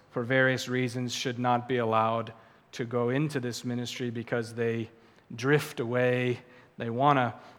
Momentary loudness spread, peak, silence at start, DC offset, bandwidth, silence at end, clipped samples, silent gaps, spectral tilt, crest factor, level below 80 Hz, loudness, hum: 11 LU; -8 dBFS; 0.15 s; under 0.1%; 17.5 kHz; 0.05 s; under 0.1%; none; -5.5 dB/octave; 20 dB; -74 dBFS; -29 LUFS; none